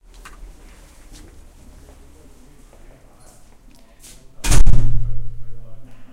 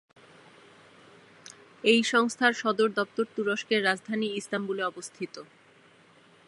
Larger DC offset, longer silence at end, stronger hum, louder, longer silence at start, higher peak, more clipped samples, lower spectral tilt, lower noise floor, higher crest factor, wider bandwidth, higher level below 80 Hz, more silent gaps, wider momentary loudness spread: neither; second, 0.1 s vs 1.05 s; neither; first, -22 LUFS vs -27 LUFS; first, 4.4 s vs 1.85 s; first, 0 dBFS vs -6 dBFS; first, 0.6% vs under 0.1%; about the same, -4.5 dB/octave vs -3.5 dB/octave; second, -45 dBFS vs -58 dBFS; second, 14 dB vs 24 dB; about the same, 12 kHz vs 11.5 kHz; first, -22 dBFS vs -82 dBFS; neither; first, 29 LU vs 16 LU